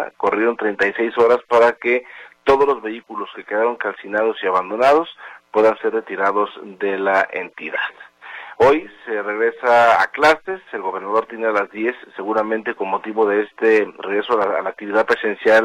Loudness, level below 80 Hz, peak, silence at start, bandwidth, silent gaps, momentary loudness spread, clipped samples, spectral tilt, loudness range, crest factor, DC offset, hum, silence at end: -18 LUFS; -56 dBFS; -4 dBFS; 0 s; 11 kHz; none; 11 LU; under 0.1%; -5 dB/octave; 3 LU; 16 dB; under 0.1%; none; 0 s